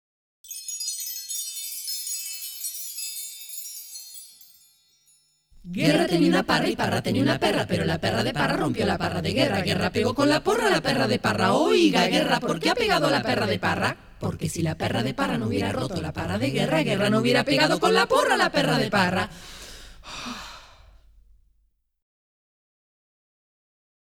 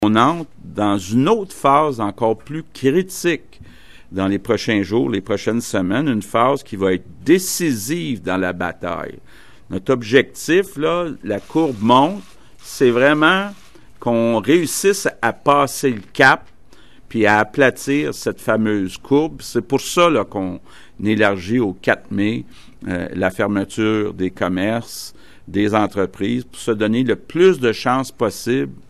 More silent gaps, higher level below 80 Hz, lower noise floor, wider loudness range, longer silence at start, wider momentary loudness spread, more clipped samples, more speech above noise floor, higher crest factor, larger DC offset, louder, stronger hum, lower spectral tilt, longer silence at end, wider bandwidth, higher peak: neither; about the same, -50 dBFS vs -50 dBFS; first, -68 dBFS vs -48 dBFS; first, 11 LU vs 4 LU; first, 0.45 s vs 0 s; first, 15 LU vs 11 LU; neither; first, 45 dB vs 30 dB; about the same, 20 dB vs 18 dB; second, under 0.1% vs 0.8%; second, -23 LUFS vs -18 LUFS; neither; about the same, -4.5 dB/octave vs -5 dB/octave; first, 3.4 s vs 0.15 s; first, 19.5 kHz vs 13 kHz; second, -6 dBFS vs 0 dBFS